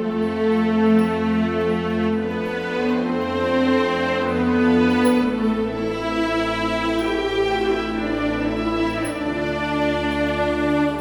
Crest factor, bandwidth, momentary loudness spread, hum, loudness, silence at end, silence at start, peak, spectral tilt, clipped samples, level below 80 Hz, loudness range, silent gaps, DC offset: 14 dB; 18 kHz; 6 LU; none; -21 LUFS; 0 s; 0 s; -6 dBFS; -6 dB/octave; under 0.1%; -40 dBFS; 3 LU; none; under 0.1%